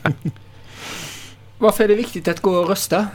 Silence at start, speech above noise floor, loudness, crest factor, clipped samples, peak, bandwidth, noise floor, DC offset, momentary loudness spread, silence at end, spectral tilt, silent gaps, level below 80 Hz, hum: 0 s; 23 dB; -19 LUFS; 20 dB; under 0.1%; 0 dBFS; 19 kHz; -40 dBFS; under 0.1%; 16 LU; 0 s; -5 dB/octave; none; -48 dBFS; none